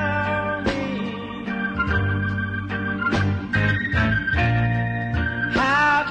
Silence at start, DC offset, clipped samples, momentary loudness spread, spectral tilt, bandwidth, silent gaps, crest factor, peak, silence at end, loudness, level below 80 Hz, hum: 0 s; under 0.1%; under 0.1%; 7 LU; -7 dB/octave; 8.8 kHz; none; 12 dB; -10 dBFS; 0 s; -22 LUFS; -36 dBFS; none